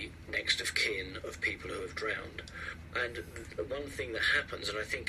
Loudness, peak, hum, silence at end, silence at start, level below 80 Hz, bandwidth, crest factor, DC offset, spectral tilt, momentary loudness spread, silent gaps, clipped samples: -34 LUFS; -14 dBFS; none; 0 s; 0 s; -54 dBFS; 13.5 kHz; 22 dB; under 0.1%; -2.5 dB/octave; 13 LU; none; under 0.1%